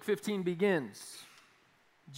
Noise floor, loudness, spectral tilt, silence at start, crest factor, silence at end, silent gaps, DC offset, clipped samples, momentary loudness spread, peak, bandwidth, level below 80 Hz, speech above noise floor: -68 dBFS; -33 LUFS; -5.5 dB/octave; 0 s; 18 dB; 0 s; none; under 0.1%; under 0.1%; 19 LU; -18 dBFS; 16 kHz; -86 dBFS; 34 dB